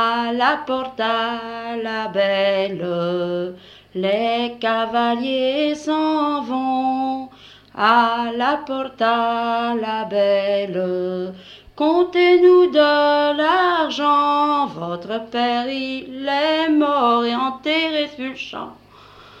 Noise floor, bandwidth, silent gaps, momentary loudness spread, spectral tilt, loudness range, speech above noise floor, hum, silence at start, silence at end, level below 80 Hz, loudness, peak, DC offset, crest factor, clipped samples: -45 dBFS; 8 kHz; none; 12 LU; -5.5 dB/octave; 5 LU; 26 dB; 50 Hz at -60 dBFS; 0 s; 0.2 s; -62 dBFS; -19 LUFS; -2 dBFS; under 0.1%; 16 dB; under 0.1%